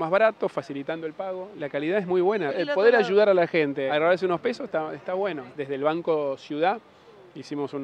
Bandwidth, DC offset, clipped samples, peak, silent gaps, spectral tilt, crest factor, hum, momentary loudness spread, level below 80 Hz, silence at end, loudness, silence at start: 9 kHz; under 0.1%; under 0.1%; -6 dBFS; none; -6.5 dB/octave; 18 dB; none; 13 LU; -76 dBFS; 0 s; -25 LUFS; 0 s